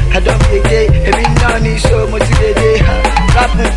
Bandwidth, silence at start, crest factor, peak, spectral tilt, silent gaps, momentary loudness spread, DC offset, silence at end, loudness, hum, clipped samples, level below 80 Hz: 11.5 kHz; 0 s; 10 dB; 0 dBFS; -5.5 dB/octave; none; 2 LU; under 0.1%; 0 s; -11 LUFS; none; under 0.1%; -12 dBFS